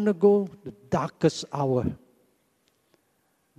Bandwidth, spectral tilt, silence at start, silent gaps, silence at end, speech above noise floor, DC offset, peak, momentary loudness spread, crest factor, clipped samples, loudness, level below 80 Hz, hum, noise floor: 10 kHz; -7 dB/octave; 0 s; none; 1.65 s; 45 dB; under 0.1%; -8 dBFS; 16 LU; 20 dB; under 0.1%; -26 LUFS; -58 dBFS; none; -70 dBFS